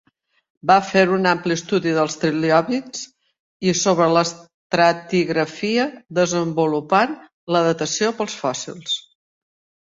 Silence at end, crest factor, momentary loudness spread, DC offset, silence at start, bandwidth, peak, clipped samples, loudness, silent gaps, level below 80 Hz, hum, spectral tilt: 0.8 s; 18 dB; 9 LU; under 0.1%; 0.65 s; 8 kHz; -2 dBFS; under 0.1%; -19 LUFS; 3.39-3.60 s, 4.54-4.70 s, 7.33-7.47 s; -62 dBFS; none; -4.5 dB/octave